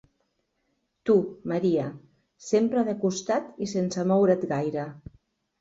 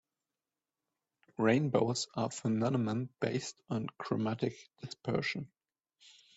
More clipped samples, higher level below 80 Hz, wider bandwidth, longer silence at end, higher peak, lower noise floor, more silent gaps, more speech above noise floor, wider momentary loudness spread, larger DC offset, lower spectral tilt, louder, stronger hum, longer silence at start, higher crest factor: neither; first, -64 dBFS vs -72 dBFS; about the same, 8 kHz vs 8.2 kHz; second, 0.6 s vs 0.9 s; first, -8 dBFS vs -14 dBFS; second, -75 dBFS vs under -90 dBFS; neither; second, 50 dB vs over 56 dB; about the same, 12 LU vs 13 LU; neither; about the same, -6.5 dB/octave vs -5.5 dB/octave; first, -26 LUFS vs -34 LUFS; neither; second, 1.05 s vs 1.4 s; about the same, 18 dB vs 20 dB